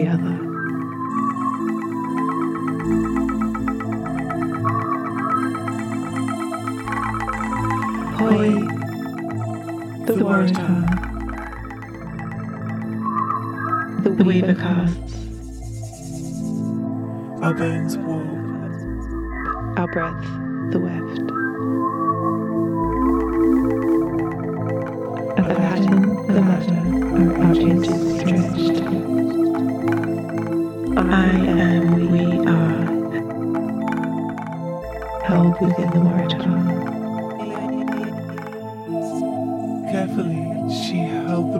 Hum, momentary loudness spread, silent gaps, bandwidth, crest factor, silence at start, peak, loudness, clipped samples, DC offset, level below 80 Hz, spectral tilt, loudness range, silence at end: none; 11 LU; none; 14 kHz; 20 dB; 0 s; -2 dBFS; -21 LUFS; under 0.1%; under 0.1%; -40 dBFS; -7.5 dB/octave; 7 LU; 0 s